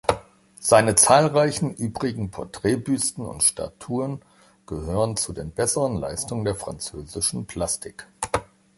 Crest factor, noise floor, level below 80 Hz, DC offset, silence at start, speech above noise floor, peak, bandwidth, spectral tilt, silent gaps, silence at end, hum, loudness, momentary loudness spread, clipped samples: 22 dB; -45 dBFS; -46 dBFS; under 0.1%; 0.1 s; 22 dB; -2 dBFS; 12 kHz; -4 dB/octave; none; 0.35 s; none; -23 LUFS; 16 LU; under 0.1%